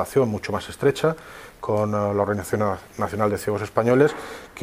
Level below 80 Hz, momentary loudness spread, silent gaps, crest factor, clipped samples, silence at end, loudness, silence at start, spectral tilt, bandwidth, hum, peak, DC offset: -52 dBFS; 13 LU; none; 20 dB; under 0.1%; 0 s; -23 LUFS; 0 s; -6.5 dB/octave; 16 kHz; none; -2 dBFS; under 0.1%